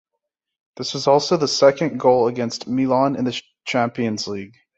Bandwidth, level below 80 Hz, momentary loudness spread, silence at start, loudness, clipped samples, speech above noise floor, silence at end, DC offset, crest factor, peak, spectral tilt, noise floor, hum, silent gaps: 8 kHz; -62 dBFS; 12 LU; 0.8 s; -20 LUFS; under 0.1%; 61 dB; 0.3 s; under 0.1%; 18 dB; -2 dBFS; -5 dB/octave; -80 dBFS; none; none